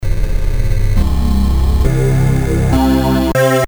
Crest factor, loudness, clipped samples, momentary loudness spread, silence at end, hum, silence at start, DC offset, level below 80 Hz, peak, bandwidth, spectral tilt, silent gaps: 12 dB; -14 LUFS; under 0.1%; 7 LU; 0 s; none; 0 s; under 0.1%; -16 dBFS; 0 dBFS; over 20 kHz; -7 dB/octave; none